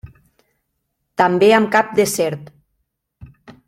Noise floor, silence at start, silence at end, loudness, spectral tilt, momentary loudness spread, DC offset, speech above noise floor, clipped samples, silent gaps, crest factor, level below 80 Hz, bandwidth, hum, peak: -73 dBFS; 0.05 s; 0.15 s; -15 LUFS; -4.5 dB/octave; 14 LU; under 0.1%; 58 dB; under 0.1%; none; 18 dB; -54 dBFS; 15.5 kHz; none; -2 dBFS